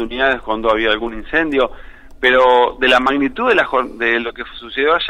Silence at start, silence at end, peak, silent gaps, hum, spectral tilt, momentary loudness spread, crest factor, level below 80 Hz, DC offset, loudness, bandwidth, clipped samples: 0 s; 0 s; -2 dBFS; none; none; -4.5 dB/octave; 8 LU; 14 dB; -38 dBFS; under 0.1%; -15 LUFS; 11 kHz; under 0.1%